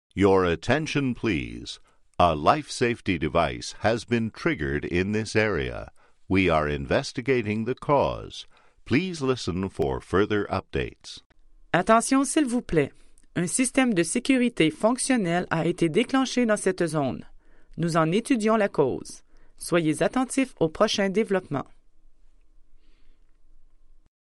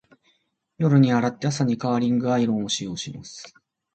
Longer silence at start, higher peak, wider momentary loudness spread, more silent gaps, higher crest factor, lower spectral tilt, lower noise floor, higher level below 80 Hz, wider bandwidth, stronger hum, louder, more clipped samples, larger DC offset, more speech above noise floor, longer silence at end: second, 0.15 s vs 0.8 s; about the same, -6 dBFS vs -6 dBFS; second, 12 LU vs 17 LU; first, 11.26-11.30 s vs none; about the same, 20 dB vs 18 dB; about the same, -5 dB/octave vs -6 dB/octave; second, -51 dBFS vs -69 dBFS; first, -48 dBFS vs -62 dBFS; first, 12.5 kHz vs 9 kHz; neither; second, -25 LUFS vs -22 LUFS; neither; neither; second, 27 dB vs 47 dB; about the same, 0.55 s vs 0.45 s